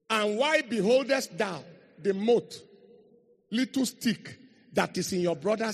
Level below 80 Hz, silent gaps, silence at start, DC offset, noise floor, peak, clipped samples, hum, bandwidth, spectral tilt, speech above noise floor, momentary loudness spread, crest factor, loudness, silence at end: -72 dBFS; none; 0.1 s; under 0.1%; -61 dBFS; -10 dBFS; under 0.1%; none; 14 kHz; -4.5 dB/octave; 34 dB; 11 LU; 20 dB; -28 LUFS; 0 s